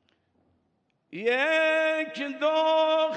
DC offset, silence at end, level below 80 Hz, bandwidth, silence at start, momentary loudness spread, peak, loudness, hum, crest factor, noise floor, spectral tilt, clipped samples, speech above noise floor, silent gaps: under 0.1%; 0 s; under -90 dBFS; 8.8 kHz; 1.15 s; 9 LU; -12 dBFS; -25 LUFS; none; 14 dB; -73 dBFS; -3.5 dB/octave; under 0.1%; 48 dB; none